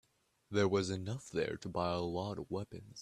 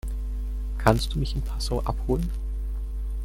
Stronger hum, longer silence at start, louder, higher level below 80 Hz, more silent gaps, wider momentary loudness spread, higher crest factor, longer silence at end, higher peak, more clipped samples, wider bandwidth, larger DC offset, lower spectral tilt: second, none vs 50 Hz at -30 dBFS; first, 0.5 s vs 0.05 s; second, -37 LUFS vs -28 LUFS; second, -66 dBFS vs -28 dBFS; neither; about the same, 9 LU vs 10 LU; second, 18 dB vs 24 dB; about the same, 0 s vs 0 s; second, -18 dBFS vs -2 dBFS; neither; second, 12.5 kHz vs 15.5 kHz; neither; about the same, -6 dB/octave vs -6 dB/octave